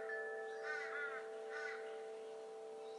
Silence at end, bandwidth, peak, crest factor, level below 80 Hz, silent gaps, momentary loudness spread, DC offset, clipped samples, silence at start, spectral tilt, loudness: 0 s; 11.5 kHz; -34 dBFS; 14 dB; under -90 dBFS; none; 8 LU; under 0.1%; under 0.1%; 0 s; -1.5 dB/octave; -47 LUFS